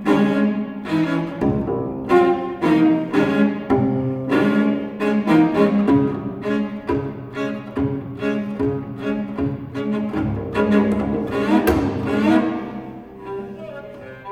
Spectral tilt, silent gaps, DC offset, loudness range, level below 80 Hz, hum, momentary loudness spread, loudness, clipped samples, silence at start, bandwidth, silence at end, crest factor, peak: -8 dB/octave; none; under 0.1%; 6 LU; -44 dBFS; none; 13 LU; -20 LUFS; under 0.1%; 0 s; 16 kHz; 0 s; 18 dB; -2 dBFS